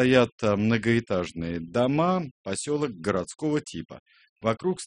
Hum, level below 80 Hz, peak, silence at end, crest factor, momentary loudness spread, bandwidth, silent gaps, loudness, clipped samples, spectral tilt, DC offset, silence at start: none; -56 dBFS; -4 dBFS; 0 s; 22 dB; 10 LU; 10.5 kHz; 0.32-0.38 s, 2.31-2.44 s, 3.99-4.06 s, 4.29-4.36 s; -26 LUFS; under 0.1%; -6 dB/octave; under 0.1%; 0 s